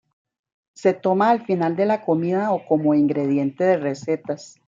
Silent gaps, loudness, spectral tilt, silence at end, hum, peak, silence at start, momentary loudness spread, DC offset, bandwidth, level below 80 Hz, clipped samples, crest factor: none; -21 LUFS; -7.5 dB/octave; 0.2 s; none; -4 dBFS; 0.8 s; 6 LU; under 0.1%; 7.6 kHz; -70 dBFS; under 0.1%; 16 dB